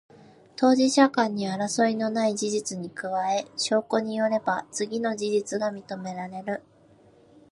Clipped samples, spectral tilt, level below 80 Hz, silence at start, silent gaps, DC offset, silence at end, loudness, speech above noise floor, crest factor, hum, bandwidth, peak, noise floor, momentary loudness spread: under 0.1%; -4 dB/octave; -74 dBFS; 0.6 s; none; under 0.1%; 0.9 s; -26 LUFS; 31 dB; 22 dB; none; 11.5 kHz; -4 dBFS; -56 dBFS; 13 LU